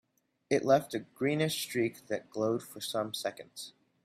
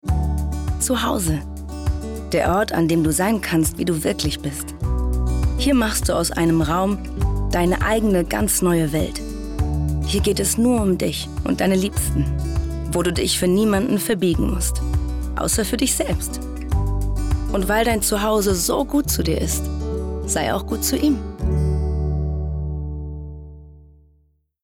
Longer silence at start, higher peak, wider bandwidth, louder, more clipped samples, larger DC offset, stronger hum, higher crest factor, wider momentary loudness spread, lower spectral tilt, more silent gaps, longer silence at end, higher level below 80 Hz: first, 0.5 s vs 0.05 s; second, -14 dBFS vs -8 dBFS; second, 16 kHz vs 18 kHz; second, -32 LUFS vs -21 LUFS; neither; neither; neither; first, 20 dB vs 12 dB; first, 15 LU vs 8 LU; about the same, -4.5 dB/octave vs -5 dB/octave; neither; second, 0.35 s vs 0.8 s; second, -74 dBFS vs -28 dBFS